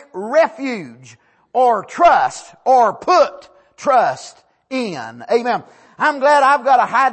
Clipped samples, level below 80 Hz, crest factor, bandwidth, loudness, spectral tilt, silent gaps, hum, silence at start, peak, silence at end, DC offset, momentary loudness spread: under 0.1%; -58 dBFS; 14 dB; 8.8 kHz; -16 LUFS; -4 dB/octave; none; none; 0.15 s; -2 dBFS; 0 s; under 0.1%; 13 LU